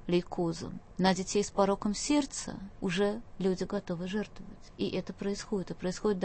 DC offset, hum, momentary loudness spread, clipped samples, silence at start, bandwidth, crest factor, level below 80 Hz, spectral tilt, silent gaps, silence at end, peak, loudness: under 0.1%; none; 10 LU; under 0.1%; 0 s; 8.8 kHz; 20 dB; -52 dBFS; -5 dB/octave; none; 0 s; -12 dBFS; -33 LUFS